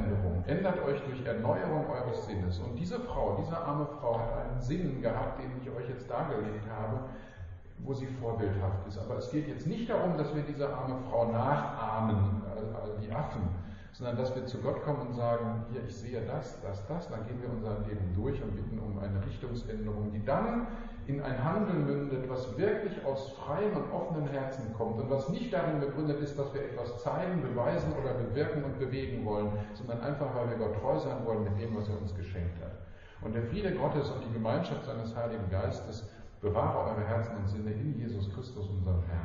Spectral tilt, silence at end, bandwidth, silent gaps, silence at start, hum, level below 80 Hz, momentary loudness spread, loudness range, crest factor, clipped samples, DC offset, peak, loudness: -7.5 dB/octave; 0 s; 7.4 kHz; none; 0 s; none; -48 dBFS; 8 LU; 4 LU; 16 dB; under 0.1%; under 0.1%; -16 dBFS; -34 LUFS